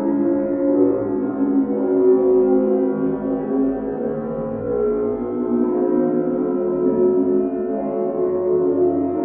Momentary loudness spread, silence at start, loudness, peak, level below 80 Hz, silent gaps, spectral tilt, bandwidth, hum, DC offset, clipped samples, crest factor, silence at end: 7 LU; 0 s; -19 LUFS; -4 dBFS; -50 dBFS; none; -11 dB/octave; 2.6 kHz; none; under 0.1%; under 0.1%; 14 dB; 0 s